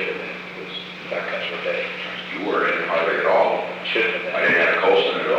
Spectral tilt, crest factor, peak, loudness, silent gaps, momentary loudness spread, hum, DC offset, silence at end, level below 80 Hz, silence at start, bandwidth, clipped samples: -4.5 dB/octave; 16 dB; -4 dBFS; -21 LUFS; none; 14 LU; 60 Hz at -45 dBFS; under 0.1%; 0 s; -66 dBFS; 0 s; 8.8 kHz; under 0.1%